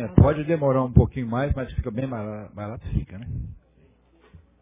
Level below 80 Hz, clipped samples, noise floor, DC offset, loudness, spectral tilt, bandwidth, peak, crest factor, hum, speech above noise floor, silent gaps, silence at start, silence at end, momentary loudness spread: -32 dBFS; under 0.1%; -58 dBFS; under 0.1%; -24 LUFS; -13 dB/octave; 3.8 kHz; -2 dBFS; 22 dB; none; 35 dB; none; 0 s; 0.25 s; 16 LU